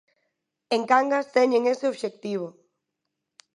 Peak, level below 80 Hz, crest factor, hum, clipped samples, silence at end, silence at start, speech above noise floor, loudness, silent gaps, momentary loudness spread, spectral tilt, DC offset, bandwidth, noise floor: -4 dBFS; -82 dBFS; 20 dB; none; under 0.1%; 1.05 s; 0.7 s; 59 dB; -24 LUFS; none; 11 LU; -4.5 dB/octave; under 0.1%; 11 kHz; -82 dBFS